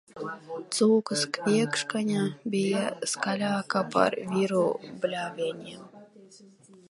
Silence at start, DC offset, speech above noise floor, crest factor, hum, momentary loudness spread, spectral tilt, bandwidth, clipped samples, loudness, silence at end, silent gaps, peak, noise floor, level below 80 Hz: 0.15 s; under 0.1%; 26 dB; 22 dB; none; 13 LU; -4.5 dB/octave; 11.5 kHz; under 0.1%; -27 LUFS; 0.45 s; none; -6 dBFS; -54 dBFS; -76 dBFS